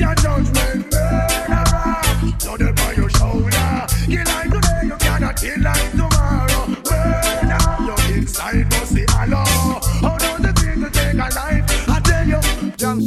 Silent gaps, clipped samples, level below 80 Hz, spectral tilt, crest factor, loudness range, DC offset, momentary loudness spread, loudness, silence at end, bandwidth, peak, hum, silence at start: none; under 0.1%; -20 dBFS; -4.5 dB/octave; 14 dB; 0 LU; under 0.1%; 3 LU; -17 LUFS; 0 s; 13.5 kHz; -2 dBFS; none; 0 s